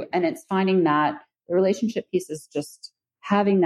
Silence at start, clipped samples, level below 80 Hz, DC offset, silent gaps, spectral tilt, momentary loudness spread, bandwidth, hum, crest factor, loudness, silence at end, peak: 0 s; under 0.1%; -72 dBFS; under 0.1%; none; -6.5 dB/octave; 18 LU; 13 kHz; none; 18 dB; -24 LUFS; 0 s; -6 dBFS